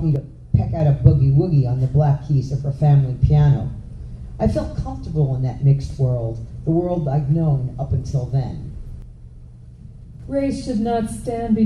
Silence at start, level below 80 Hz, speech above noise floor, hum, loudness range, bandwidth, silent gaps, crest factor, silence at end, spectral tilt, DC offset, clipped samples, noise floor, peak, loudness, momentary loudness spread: 0 s; -32 dBFS; 22 dB; none; 8 LU; 10.5 kHz; none; 18 dB; 0 s; -9.5 dB/octave; under 0.1%; under 0.1%; -40 dBFS; 0 dBFS; -20 LUFS; 14 LU